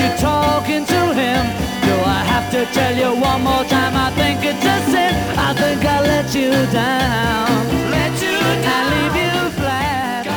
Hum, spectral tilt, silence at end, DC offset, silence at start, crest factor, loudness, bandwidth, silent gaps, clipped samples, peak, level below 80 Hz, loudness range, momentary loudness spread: none; -5 dB/octave; 0 s; under 0.1%; 0 s; 14 dB; -16 LUFS; over 20 kHz; none; under 0.1%; -2 dBFS; -34 dBFS; 1 LU; 3 LU